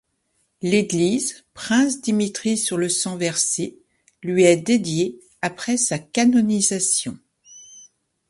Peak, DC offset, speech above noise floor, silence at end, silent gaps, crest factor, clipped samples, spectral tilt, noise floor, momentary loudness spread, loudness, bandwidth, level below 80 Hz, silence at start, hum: -2 dBFS; under 0.1%; 49 dB; 0.5 s; none; 20 dB; under 0.1%; -3.5 dB/octave; -69 dBFS; 11 LU; -20 LUFS; 11.5 kHz; -62 dBFS; 0.6 s; none